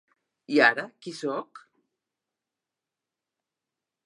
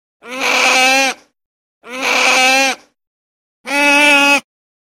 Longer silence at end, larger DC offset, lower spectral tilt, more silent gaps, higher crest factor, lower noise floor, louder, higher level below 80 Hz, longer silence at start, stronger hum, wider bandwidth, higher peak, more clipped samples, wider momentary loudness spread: first, 2.45 s vs 0.4 s; neither; first, -4 dB/octave vs 0.5 dB/octave; second, none vs 1.46-1.81 s, 3.07-3.64 s; first, 26 dB vs 16 dB; about the same, -88 dBFS vs under -90 dBFS; second, -25 LUFS vs -11 LUFS; second, -88 dBFS vs -70 dBFS; first, 0.5 s vs 0.25 s; neither; second, 11.5 kHz vs 16.5 kHz; second, -6 dBFS vs 0 dBFS; neither; about the same, 15 LU vs 17 LU